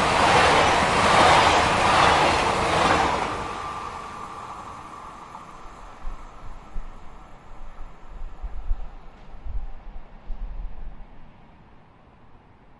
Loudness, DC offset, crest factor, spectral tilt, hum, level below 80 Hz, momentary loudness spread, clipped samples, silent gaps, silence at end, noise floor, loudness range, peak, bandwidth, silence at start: -19 LUFS; under 0.1%; 20 dB; -3.5 dB/octave; none; -36 dBFS; 26 LU; under 0.1%; none; 1.05 s; -51 dBFS; 25 LU; -4 dBFS; 11.5 kHz; 0 s